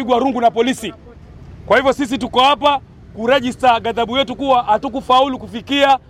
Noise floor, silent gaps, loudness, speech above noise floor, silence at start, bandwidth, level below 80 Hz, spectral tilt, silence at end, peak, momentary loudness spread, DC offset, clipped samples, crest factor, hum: -38 dBFS; none; -16 LUFS; 22 dB; 0 s; 15.5 kHz; -44 dBFS; -4 dB/octave; 0.15 s; -2 dBFS; 6 LU; under 0.1%; under 0.1%; 14 dB; none